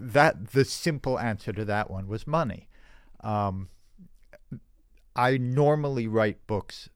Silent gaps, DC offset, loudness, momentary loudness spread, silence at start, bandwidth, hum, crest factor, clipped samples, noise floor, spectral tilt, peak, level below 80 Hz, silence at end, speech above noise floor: none; under 0.1%; -27 LUFS; 19 LU; 0 s; 16.5 kHz; none; 22 dB; under 0.1%; -58 dBFS; -6 dB/octave; -6 dBFS; -52 dBFS; 0.05 s; 32 dB